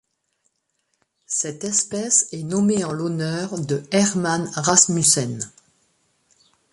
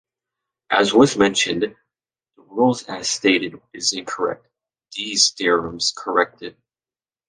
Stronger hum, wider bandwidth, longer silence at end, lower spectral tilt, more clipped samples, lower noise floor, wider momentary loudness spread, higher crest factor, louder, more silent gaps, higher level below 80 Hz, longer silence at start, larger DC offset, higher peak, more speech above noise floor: neither; first, 12 kHz vs 10 kHz; first, 1.25 s vs 0.8 s; about the same, -3.5 dB/octave vs -2.5 dB/octave; neither; second, -72 dBFS vs under -90 dBFS; second, 11 LU vs 15 LU; about the same, 22 dB vs 20 dB; about the same, -20 LUFS vs -19 LUFS; neither; about the same, -60 dBFS vs -58 dBFS; first, 1.3 s vs 0.7 s; neither; about the same, 0 dBFS vs -2 dBFS; second, 51 dB vs over 70 dB